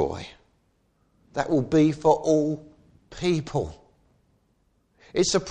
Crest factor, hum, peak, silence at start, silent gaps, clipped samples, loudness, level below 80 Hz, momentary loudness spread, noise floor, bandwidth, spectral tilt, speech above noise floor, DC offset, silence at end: 20 dB; none; -6 dBFS; 0 s; none; under 0.1%; -24 LUFS; -52 dBFS; 16 LU; -67 dBFS; 9.6 kHz; -5.5 dB/octave; 44 dB; under 0.1%; 0 s